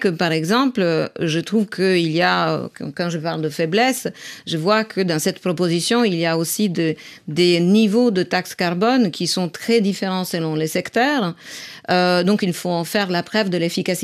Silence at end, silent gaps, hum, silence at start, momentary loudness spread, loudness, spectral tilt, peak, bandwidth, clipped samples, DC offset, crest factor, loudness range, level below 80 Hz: 0 s; none; none; 0 s; 8 LU; -19 LUFS; -5 dB/octave; -4 dBFS; 15.5 kHz; under 0.1%; under 0.1%; 16 dB; 2 LU; -66 dBFS